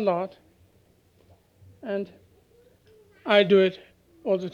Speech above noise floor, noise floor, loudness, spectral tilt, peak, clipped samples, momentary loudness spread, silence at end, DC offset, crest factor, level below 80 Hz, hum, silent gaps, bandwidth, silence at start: 38 dB; -61 dBFS; -24 LUFS; -7 dB/octave; -6 dBFS; under 0.1%; 21 LU; 0.05 s; under 0.1%; 22 dB; -70 dBFS; none; none; 7 kHz; 0 s